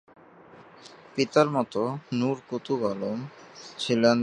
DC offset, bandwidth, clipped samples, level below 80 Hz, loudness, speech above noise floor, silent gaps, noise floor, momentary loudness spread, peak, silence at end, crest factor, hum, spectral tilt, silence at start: under 0.1%; 10.5 kHz; under 0.1%; -70 dBFS; -27 LUFS; 25 dB; none; -51 dBFS; 21 LU; -6 dBFS; 0 s; 22 dB; none; -5.5 dB/octave; 0.6 s